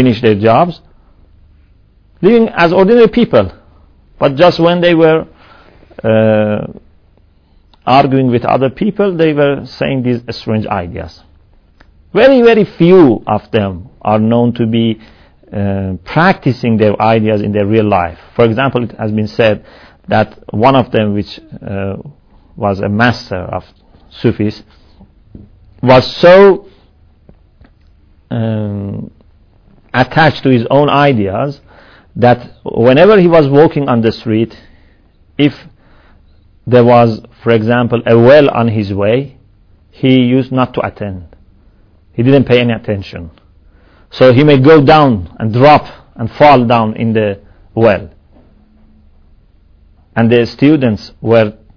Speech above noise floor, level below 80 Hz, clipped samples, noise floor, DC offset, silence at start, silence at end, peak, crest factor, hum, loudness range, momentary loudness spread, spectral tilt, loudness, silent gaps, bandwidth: 38 dB; -40 dBFS; 2%; -48 dBFS; under 0.1%; 0 s; 0.25 s; 0 dBFS; 12 dB; none; 6 LU; 15 LU; -8.5 dB/octave; -10 LUFS; none; 5.4 kHz